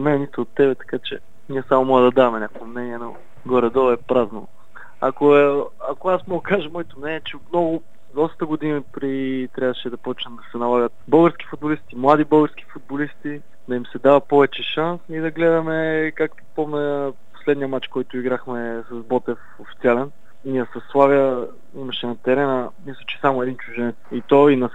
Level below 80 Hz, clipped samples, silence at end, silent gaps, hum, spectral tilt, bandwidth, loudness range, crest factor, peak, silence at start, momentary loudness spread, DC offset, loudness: -62 dBFS; under 0.1%; 0.05 s; none; none; -8 dB/octave; 8 kHz; 5 LU; 20 dB; 0 dBFS; 0 s; 15 LU; 2%; -20 LUFS